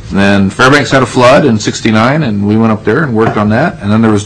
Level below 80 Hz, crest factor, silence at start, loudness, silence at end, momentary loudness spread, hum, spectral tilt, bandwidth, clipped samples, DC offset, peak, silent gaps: -36 dBFS; 8 dB; 0 s; -8 LUFS; 0 s; 5 LU; none; -6 dB/octave; 11 kHz; 0.4%; under 0.1%; 0 dBFS; none